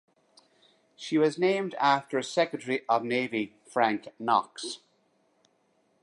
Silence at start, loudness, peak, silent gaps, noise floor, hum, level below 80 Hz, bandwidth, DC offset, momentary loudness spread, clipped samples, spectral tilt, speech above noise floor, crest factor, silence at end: 1 s; -28 LUFS; -10 dBFS; none; -70 dBFS; none; -82 dBFS; 11.5 kHz; under 0.1%; 12 LU; under 0.1%; -4.5 dB/octave; 42 dB; 20 dB; 1.25 s